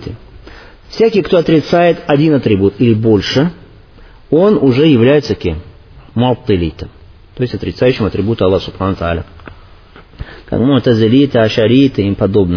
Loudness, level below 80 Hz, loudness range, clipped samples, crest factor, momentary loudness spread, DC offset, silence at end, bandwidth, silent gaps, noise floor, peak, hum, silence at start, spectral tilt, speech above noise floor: -12 LUFS; -36 dBFS; 5 LU; under 0.1%; 12 dB; 12 LU; under 0.1%; 0 s; 5.4 kHz; none; -39 dBFS; 0 dBFS; none; 0 s; -8 dB/octave; 27 dB